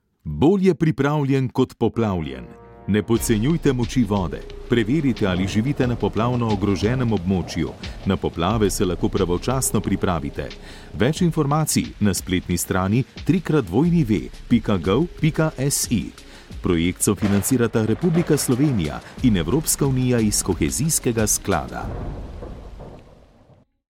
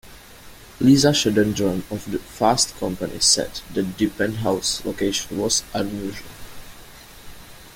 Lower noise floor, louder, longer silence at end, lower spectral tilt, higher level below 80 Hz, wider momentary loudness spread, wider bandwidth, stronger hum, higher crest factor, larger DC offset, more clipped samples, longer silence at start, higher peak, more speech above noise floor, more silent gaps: first, -54 dBFS vs -43 dBFS; about the same, -21 LUFS vs -21 LUFS; first, 0.95 s vs 0 s; first, -5.5 dB/octave vs -3.5 dB/octave; first, -38 dBFS vs -46 dBFS; second, 11 LU vs 14 LU; about the same, 16.5 kHz vs 17 kHz; neither; about the same, 16 dB vs 20 dB; neither; neither; first, 0.25 s vs 0.05 s; second, -6 dBFS vs -2 dBFS; first, 33 dB vs 22 dB; neither